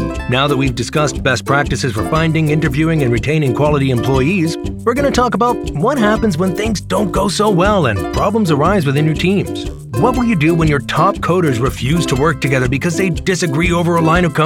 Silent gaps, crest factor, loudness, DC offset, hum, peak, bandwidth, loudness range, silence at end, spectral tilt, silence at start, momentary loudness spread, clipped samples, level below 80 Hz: none; 14 dB; -14 LUFS; under 0.1%; none; 0 dBFS; 16.5 kHz; 1 LU; 0 s; -6 dB/octave; 0 s; 4 LU; under 0.1%; -30 dBFS